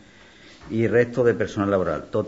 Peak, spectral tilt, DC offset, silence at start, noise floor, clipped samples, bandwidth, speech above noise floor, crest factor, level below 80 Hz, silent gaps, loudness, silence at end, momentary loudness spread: -6 dBFS; -7.5 dB/octave; under 0.1%; 0.6 s; -49 dBFS; under 0.1%; 8 kHz; 28 dB; 18 dB; -52 dBFS; none; -22 LUFS; 0 s; 5 LU